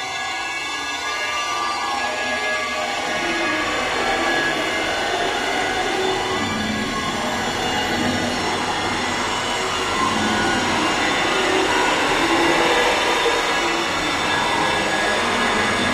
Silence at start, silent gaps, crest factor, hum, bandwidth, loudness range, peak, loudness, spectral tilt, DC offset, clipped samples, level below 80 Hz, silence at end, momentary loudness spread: 0 s; none; 16 dB; none; 16 kHz; 4 LU; -4 dBFS; -20 LUFS; -2.5 dB/octave; under 0.1%; under 0.1%; -44 dBFS; 0 s; 5 LU